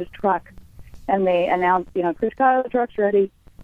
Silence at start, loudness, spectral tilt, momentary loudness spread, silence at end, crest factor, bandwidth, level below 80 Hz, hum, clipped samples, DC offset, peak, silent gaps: 0 s; -21 LUFS; -8 dB/octave; 6 LU; 0 s; 16 dB; 5.6 kHz; -50 dBFS; none; under 0.1%; under 0.1%; -4 dBFS; none